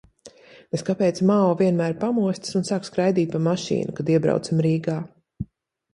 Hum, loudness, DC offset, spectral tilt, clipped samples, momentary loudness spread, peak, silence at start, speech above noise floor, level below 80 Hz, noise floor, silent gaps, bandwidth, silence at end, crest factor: none; -22 LUFS; under 0.1%; -7 dB/octave; under 0.1%; 12 LU; -6 dBFS; 0.25 s; 37 dB; -56 dBFS; -59 dBFS; none; 11 kHz; 0.5 s; 16 dB